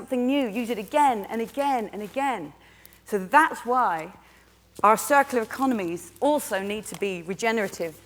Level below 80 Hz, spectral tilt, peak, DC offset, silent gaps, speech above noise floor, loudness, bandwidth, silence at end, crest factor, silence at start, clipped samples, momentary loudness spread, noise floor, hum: -62 dBFS; -4 dB/octave; -4 dBFS; under 0.1%; none; 31 dB; -25 LUFS; over 20 kHz; 0.1 s; 22 dB; 0 s; under 0.1%; 11 LU; -56 dBFS; none